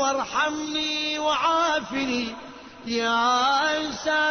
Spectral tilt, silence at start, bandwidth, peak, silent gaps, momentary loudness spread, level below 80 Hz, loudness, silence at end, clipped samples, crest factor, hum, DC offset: -2 dB/octave; 0 s; 6.6 kHz; -12 dBFS; none; 10 LU; -58 dBFS; -23 LUFS; 0 s; under 0.1%; 14 dB; none; under 0.1%